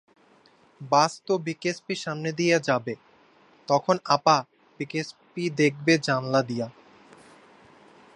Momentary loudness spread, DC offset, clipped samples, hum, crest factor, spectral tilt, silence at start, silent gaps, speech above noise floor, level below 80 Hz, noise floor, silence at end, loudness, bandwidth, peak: 15 LU; under 0.1%; under 0.1%; none; 22 dB; -5 dB/octave; 0.8 s; none; 34 dB; -74 dBFS; -59 dBFS; 1.45 s; -25 LUFS; 11 kHz; -4 dBFS